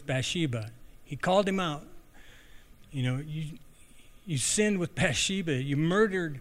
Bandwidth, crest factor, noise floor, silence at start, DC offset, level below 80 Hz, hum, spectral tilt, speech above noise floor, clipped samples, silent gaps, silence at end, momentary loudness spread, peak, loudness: 15.5 kHz; 20 dB; -52 dBFS; 0 s; under 0.1%; -54 dBFS; none; -4.5 dB/octave; 24 dB; under 0.1%; none; 0 s; 15 LU; -12 dBFS; -29 LUFS